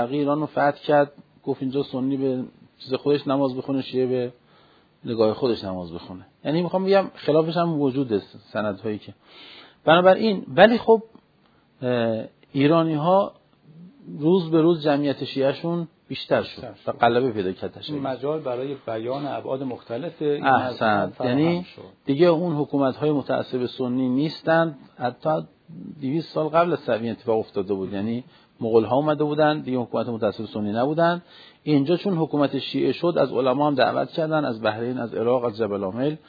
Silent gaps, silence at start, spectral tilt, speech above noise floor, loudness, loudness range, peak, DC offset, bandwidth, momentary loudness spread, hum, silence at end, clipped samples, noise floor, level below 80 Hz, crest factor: none; 0 s; -9 dB/octave; 37 dB; -23 LUFS; 5 LU; 0 dBFS; under 0.1%; 5 kHz; 12 LU; none; 0.1 s; under 0.1%; -60 dBFS; -66 dBFS; 22 dB